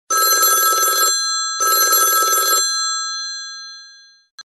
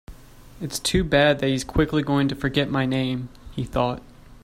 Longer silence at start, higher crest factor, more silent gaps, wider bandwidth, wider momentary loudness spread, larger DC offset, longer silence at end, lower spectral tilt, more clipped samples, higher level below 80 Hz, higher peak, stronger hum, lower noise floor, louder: about the same, 0.1 s vs 0.1 s; about the same, 16 dB vs 20 dB; first, 4.31-4.38 s vs none; second, 12.5 kHz vs 16 kHz; about the same, 15 LU vs 14 LU; neither; about the same, 0 s vs 0.05 s; second, 3.5 dB/octave vs -5 dB/octave; neither; second, -76 dBFS vs -40 dBFS; about the same, -2 dBFS vs -4 dBFS; neither; about the same, -45 dBFS vs -45 dBFS; first, -14 LUFS vs -23 LUFS